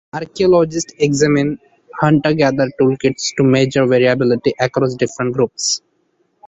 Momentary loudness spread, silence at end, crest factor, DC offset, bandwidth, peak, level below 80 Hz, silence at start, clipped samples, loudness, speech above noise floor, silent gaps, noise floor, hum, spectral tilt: 6 LU; 0.7 s; 14 dB; under 0.1%; 8.4 kHz; 0 dBFS; -50 dBFS; 0.15 s; under 0.1%; -15 LUFS; 48 dB; none; -63 dBFS; none; -5 dB/octave